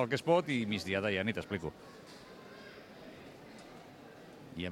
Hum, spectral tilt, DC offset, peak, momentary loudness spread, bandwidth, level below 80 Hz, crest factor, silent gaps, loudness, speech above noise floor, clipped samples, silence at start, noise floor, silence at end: none; -5.5 dB/octave; under 0.1%; -14 dBFS; 22 LU; 16.5 kHz; -68 dBFS; 22 dB; none; -34 LUFS; 19 dB; under 0.1%; 0 s; -53 dBFS; 0 s